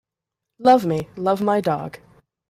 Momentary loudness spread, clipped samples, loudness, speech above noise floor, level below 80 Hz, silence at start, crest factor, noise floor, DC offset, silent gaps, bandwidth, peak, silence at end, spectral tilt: 10 LU; under 0.1%; -20 LUFS; 66 dB; -60 dBFS; 0.6 s; 18 dB; -85 dBFS; under 0.1%; none; 15.5 kHz; -4 dBFS; 0.55 s; -7 dB/octave